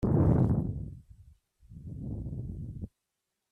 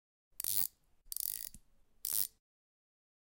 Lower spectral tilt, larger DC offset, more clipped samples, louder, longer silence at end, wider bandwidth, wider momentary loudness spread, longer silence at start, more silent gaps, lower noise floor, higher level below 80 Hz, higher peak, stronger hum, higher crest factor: first, -12 dB/octave vs 1 dB/octave; neither; neither; first, -31 LUFS vs -36 LUFS; second, 0.65 s vs 1.1 s; second, 2.5 kHz vs 17.5 kHz; first, 21 LU vs 11 LU; second, 0 s vs 0.4 s; neither; first, -85 dBFS vs -62 dBFS; first, -44 dBFS vs -70 dBFS; about the same, -14 dBFS vs -14 dBFS; neither; second, 18 dB vs 28 dB